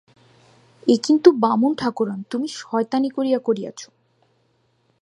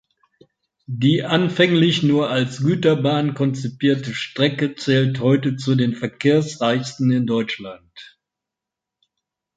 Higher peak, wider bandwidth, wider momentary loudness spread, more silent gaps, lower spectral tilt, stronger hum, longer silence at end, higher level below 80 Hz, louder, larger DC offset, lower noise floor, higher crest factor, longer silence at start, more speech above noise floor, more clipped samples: about the same, 0 dBFS vs -2 dBFS; first, 11 kHz vs 9.2 kHz; first, 12 LU vs 7 LU; neither; about the same, -5.5 dB/octave vs -6.5 dB/octave; neither; second, 1.2 s vs 1.5 s; second, -68 dBFS vs -60 dBFS; about the same, -20 LUFS vs -19 LUFS; neither; second, -65 dBFS vs -85 dBFS; about the same, 20 dB vs 18 dB; about the same, 0.85 s vs 0.9 s; second, 45 dB vs 67 dB; neither